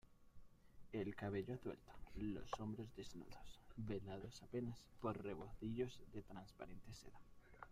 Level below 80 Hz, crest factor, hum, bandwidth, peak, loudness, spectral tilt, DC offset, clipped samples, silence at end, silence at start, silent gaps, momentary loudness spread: -64 dBFS; 18 dB; none; 15.5 kHz; -32 dBFS; -51 LUFS; -7 dB/octave; under 0.1%; under 0.1%; 0 s; 0.05 s; none; 13 LU